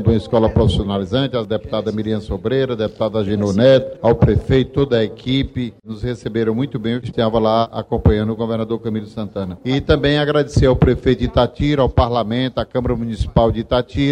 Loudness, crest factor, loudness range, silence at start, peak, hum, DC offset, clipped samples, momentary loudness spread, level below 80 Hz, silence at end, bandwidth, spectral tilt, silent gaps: -18 LUFS; 16 dB; 3 LU; 0 s; 0 dBFS; none; under 0.1%; under 0.1%; 8 LU; -30 dBFS; 0 s; 10 kHz; -7.5 dB/octave; none